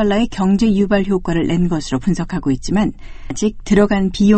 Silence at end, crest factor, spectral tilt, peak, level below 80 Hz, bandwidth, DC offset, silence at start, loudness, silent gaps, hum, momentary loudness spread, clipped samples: 0 s; 16 dB; -6.5 dB/octave; 0 dBFS; -30 dBFS; 8.8 kHz; under 0.1%; 0 s; -17 LUFS; none; none; 7 LU; under 0.1%